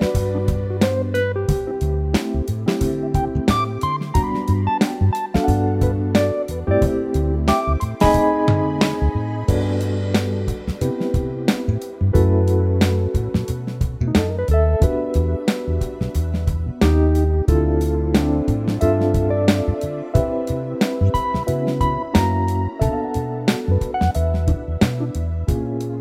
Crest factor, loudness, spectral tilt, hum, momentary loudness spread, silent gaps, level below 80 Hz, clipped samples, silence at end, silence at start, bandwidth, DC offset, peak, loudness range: 16 dB; -20 LUFS; -7.5 dB/octave; none; 6 LU; none; -26 dBFS; under 0.1%; 0 s; 0 s; 15.5 kHz; under 0.1%; -4 dBFS; 2 LU